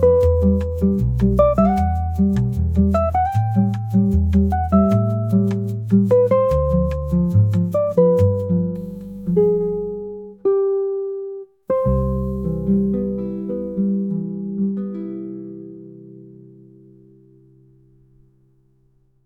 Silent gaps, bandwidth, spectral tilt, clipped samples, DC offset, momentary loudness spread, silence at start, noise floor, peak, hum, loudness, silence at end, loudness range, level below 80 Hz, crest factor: none; 7.4 kHz; -10.5 dB/octave; under 0.1%; under 0.1%; 14 LU; 0 s; -60 dBFS; -4 dBFS; none; -19 LUFS; 2.95 s; 9 LU; -30 dBFS; 16 dB